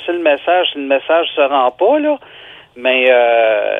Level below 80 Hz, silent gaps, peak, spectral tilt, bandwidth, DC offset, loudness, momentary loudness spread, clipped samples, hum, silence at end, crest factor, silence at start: -64 dBFS; none; 0 dBFS; -5 dB/octave; 3.9 kHz; under 0.1%; -13 LUFS; 7 LU; under 0.1%; none; 0 s; 14 dB; 0 s